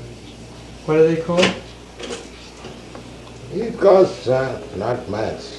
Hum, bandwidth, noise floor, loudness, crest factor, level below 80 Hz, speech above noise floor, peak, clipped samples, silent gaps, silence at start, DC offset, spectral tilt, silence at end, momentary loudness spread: none; 11.5 kHz; -38 dBFS; -18 LUFS; 20 dB; -46 dBFS; 20 dB; -2 dBFS; under 0.1%; none; 0 s; under 0.1%; -5.5 dB/octave; 0 s; 23 LU